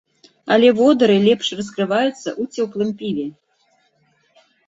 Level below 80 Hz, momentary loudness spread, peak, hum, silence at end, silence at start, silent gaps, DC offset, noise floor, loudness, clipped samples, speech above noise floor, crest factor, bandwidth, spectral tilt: -62 dBFS; 13 LU; -2 dBFS; none; 1.4 s; 0.45 s; none; under 0.1%; -62 dBFS; -18 LUFS; under 0.1%; 45 dB; 16 dB; 8 kHz; -5.5 dB/octave